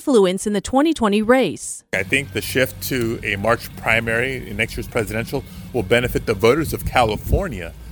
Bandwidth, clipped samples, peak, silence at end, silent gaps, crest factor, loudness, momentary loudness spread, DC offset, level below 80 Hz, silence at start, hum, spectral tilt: over 20 kHz; under 0.1%; 0 dBFS; 0 s; none; 20 dB; -20 LUFS; 8 LU; under 0.1%; -34 dBFS; 0 s; none; -5 dB/octave